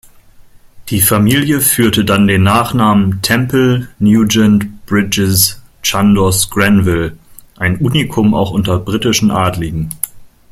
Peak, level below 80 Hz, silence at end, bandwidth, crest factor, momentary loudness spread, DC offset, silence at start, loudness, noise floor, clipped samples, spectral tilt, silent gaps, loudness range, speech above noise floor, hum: 0 dBFS; -36 dBFS; 0.25 s; 16 kHz; 12 dB; 8 LU; under 0.1%; 0.4 s; -12 LUFS; -40 dBFS; under 0.1%; -4.5 dB/octave; none; 3 LU; 29 dB; none